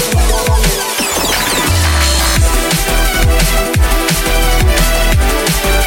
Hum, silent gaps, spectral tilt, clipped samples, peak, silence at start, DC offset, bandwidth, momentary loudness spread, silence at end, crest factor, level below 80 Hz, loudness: none; none; -3.5 dB/octave; under 0.1%; 0 dBFS; 0 s; under 0.1%; 17 kHz; 2 LU; 0 s; 10 dB; -14 dBFS; -12 LUFS